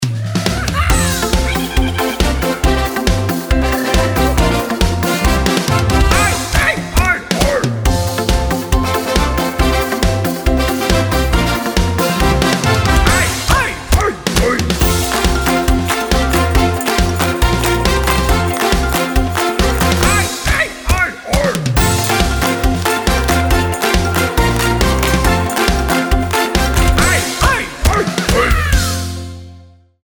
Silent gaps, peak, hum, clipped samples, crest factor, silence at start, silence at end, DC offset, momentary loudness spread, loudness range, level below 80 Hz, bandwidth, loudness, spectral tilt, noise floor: none; 0 dBFS; none; under 0.1%; 14 dB; 0 s; 0.4 s; under 0.1%; 3 LU; 2 LU; -18 dBFS; over 20 kHz; -14 LUFS; -4.5 dB/octave; -41 dBFS